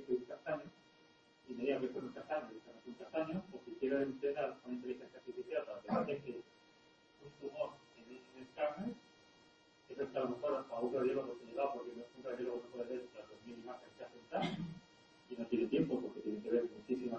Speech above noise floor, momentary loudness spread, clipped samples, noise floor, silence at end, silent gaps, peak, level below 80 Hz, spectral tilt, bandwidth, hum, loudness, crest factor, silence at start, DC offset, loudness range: 28 dB; 17 LU; under 0.1%; -68 dBFS; 0 s; none; -22 dBFS; -78 dBFS; -7 dB/octave; 8.2 kHz; none; -42 LUFS; 20 dB; 0 s; under 0.1%; 5 LU